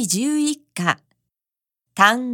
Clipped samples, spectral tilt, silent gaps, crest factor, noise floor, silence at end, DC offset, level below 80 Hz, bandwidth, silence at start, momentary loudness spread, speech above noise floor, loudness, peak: under 0.1%; -3 dB/octave; none; 22 dB; -89 dBFS; 0 s; under 0.1%; -74 dBFS; 18 kHz; 0 s; 11 LU; 70 dB; -20 LUFS; 0 dBFS